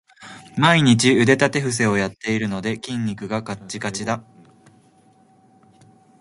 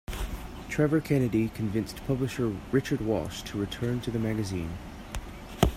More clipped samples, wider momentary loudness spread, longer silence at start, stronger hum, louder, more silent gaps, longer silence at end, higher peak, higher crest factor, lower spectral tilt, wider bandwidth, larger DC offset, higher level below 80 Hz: neither; about the same, 14 LU vs 14 LU; about the same, 0.2 s vs 0.1 s; neither; first, -20 LUFS vs -30 LUFS; neither; first, 2 s vs 0 s; first, 0 dBFS vs -6 dBFS; about the same, 20 dB vs 24 dB; second, -5 dB/octave vs -6.5 dB/octave; second, 11.5 kHz vs 16 kHz; neither; second, -56 dBFS vs -42 dBFS